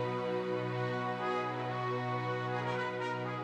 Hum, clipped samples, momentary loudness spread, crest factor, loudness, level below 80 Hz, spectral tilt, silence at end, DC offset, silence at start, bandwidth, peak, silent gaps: none; under 0.1%; 2 LU; 12 dB; -35 LUFS; -74 dBFS; -7 dB/octave; 0 s; under 0.1%; 0 s; 9.4 kHz; -24 dBFS; none